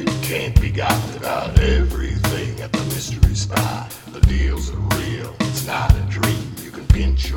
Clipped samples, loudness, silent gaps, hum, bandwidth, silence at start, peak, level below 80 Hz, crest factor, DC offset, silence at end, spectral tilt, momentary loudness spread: under 0.1%; -20 LUFS; none; none; 18 kHz; 0 s; 0 dBFS; -22 dBFS; 18 dB; under 0.1%; 0 s; -5.5 dB/octave; 7 LU